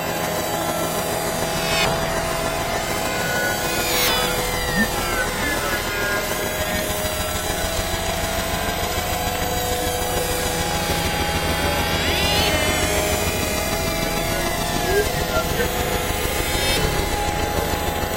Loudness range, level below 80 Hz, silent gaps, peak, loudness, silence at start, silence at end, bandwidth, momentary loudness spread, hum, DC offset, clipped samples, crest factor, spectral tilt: 3 LU; -32 dBFS; none; -6 dBFS; -21 LUFS; 0 s; 0 s; 16 kHz; 4 LU; none; under 0.1%; under 0.1%; 16 dB; -3 dB/octave